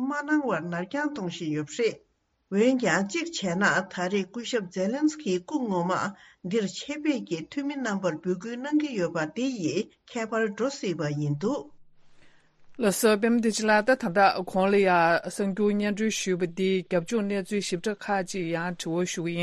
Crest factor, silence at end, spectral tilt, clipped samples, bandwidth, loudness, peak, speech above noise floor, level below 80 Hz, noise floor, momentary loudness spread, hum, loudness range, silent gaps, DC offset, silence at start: 18 dB; 0 s; -5 dB/octave; under 0.1%; 12.5 kHz; -27 LUFS; -8 dBFS; 27 dB; -66 dBFS; -54 dBFS; 9 LU; none; 6 LU; none; under 0.1%; 0 s